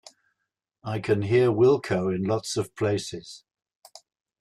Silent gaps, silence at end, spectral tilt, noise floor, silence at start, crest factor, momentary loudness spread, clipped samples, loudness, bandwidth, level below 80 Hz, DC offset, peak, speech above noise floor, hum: none; 1.05 s; -6 dB/octave; -82 dBFS; 0.85 s; 16 dB; 17 LU; under 0.1%; -24 LUFS; 12.5 kHz; -62 dBFS; under 0.1%; -10 dBFS; 58 dB; none